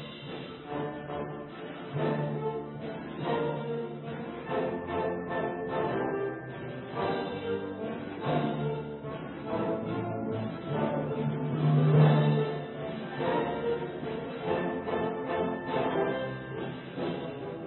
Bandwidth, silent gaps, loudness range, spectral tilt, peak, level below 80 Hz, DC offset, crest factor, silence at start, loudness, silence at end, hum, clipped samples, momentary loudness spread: 4.2 kHz; none; 7 LU; -11.5 dB/octave; -12 dBFS; -60 dBFS; under 0.1%; 20 dB; 0 s; -32 LUFS; 0 s; none; under 0.1%; 10 LU